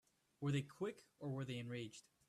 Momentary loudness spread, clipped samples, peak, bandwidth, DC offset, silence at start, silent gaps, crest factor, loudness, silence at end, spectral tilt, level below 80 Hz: 8 LU; under 0.1%; -30 dBFS; 13 kHz; under 0.1%; 0.4 s; none; 16 dB; -46 LUFS; 0.3 s; -6.5 dB/octave; -80 dBFS